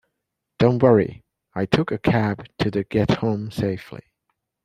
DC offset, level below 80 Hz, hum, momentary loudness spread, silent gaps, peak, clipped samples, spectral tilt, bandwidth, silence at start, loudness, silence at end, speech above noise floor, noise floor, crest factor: under 0.1%; -50 dBFS; none; 14 LU; none; -2 dBFS; under 0.1%; -8 dB/octave; 13.5 kHz; 0.6 s; -21 LUFS; 0.65 s; 60 dB; -80 dBFS; 20 dB